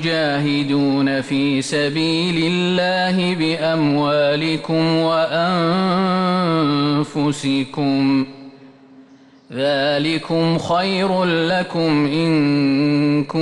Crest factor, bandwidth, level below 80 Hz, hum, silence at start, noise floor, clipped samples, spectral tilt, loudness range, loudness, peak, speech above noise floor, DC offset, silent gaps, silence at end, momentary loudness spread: 10 dB; 11 kHz; -56 dBFS; none; 0 s; -47 dBFS; under 0.1%; -6 dB/octave; 3 LU; -18 LUFS; -8 dBFS; 29 dB; under 0.1%; none; 0 s; 3 LU